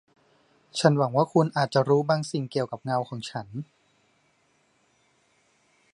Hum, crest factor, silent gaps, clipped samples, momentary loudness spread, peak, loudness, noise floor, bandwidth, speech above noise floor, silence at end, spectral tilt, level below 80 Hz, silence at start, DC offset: none; 24 dB; none; under 0.1%; 13 LU; -4 dBFS; -25 LUFS; -67 dBFS; 11.5 kHz; 42 dB; 2.3 s; -6 dB/octave; -72 dBFS; 0.75 s; under 0.1%